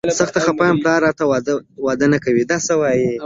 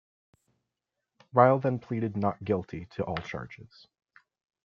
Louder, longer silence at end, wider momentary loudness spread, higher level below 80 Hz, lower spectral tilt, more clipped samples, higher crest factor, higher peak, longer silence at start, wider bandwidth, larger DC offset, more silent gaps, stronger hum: first, -17 LUFS vs -28 LUFS; second, 0 s vs 1 s; second, 5 LU vs 18 LU; first, -52 dBFS vs -64 dBFS; second, -5 dB/octave vs -8.5 dB/octave; neither; second, 16 dB vs 26 dB; about the same, -2 dBFS vs -4 dBFS; second, 0.05 s vs 1.35 s; first, 7.8 kHz vs 7 kHz; neither; neither; neither